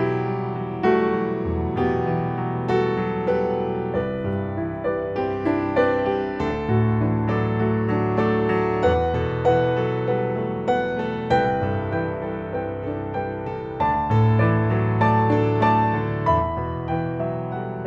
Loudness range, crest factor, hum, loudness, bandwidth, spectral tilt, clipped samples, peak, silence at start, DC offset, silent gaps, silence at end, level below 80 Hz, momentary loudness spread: 4 LU; 16 dB; none; -22 LUFS; 7 kHz; -9 dB/octave; under 0.1%; -6 dBFS; 0 s; under 0.1%; none; 0 s; -42 dBFS; 8 LU